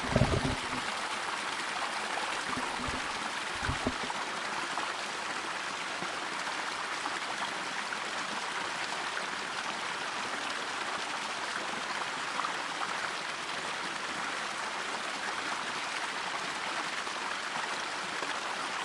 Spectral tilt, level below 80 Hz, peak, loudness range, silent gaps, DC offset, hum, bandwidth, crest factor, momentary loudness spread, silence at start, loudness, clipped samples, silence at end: -2.5 dB/octave; -54 dBFS; -12 dBFS; 1 LU; none; under 0.1%; none; 11.5 kHz; 24 dB; 2 LU; 0 s; -34 LUFS; under 0.1%; 0 s